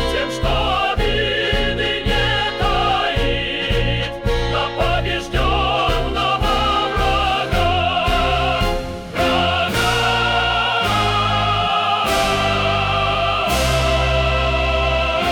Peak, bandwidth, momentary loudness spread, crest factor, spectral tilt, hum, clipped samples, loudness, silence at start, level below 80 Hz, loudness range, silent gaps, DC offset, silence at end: -8 dBFS; 20 kHz; 3 LU; 10 dB; -4.5 dB/octave; none; under 0.1%; -18 LUFS; 0 s; -26 dBFS; 2 LU; none; under 0.1%; 0 s